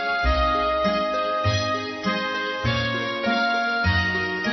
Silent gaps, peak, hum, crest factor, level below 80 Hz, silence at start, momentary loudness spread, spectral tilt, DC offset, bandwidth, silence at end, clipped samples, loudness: none; -10 dBFS; none; 14 dB; -36 dBFS; 0 s; 4 LU; -5.5 dB/octave; under 0.1%; 6.2 kHz; 0 s; under 0.1%; -23 LUFS